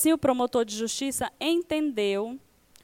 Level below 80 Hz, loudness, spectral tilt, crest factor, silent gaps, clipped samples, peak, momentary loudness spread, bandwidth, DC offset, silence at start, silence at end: -60 dBFS; -27 LUFS; -3.5 dB/octave; 18 dB; none; under 0.1%; -10 dBFS; 7 LU; 17 kHz; under 0.1%; 0 s; 0.45 s